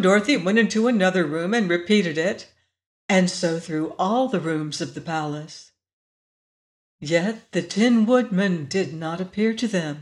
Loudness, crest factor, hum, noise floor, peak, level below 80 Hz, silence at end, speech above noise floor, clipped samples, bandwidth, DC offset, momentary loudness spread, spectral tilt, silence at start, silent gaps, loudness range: -22 LUFS; 16 dB; none; under -90 dBFS; -6 dBFS; -68 dBFS; 0 s; over 68 dB; under 0.1%; 11 kHz; under 0.1%; 10 LU; -5.5 dB/octave; 0 s; 2.86-3.09 s, 5.93-6.99 s; 7 LU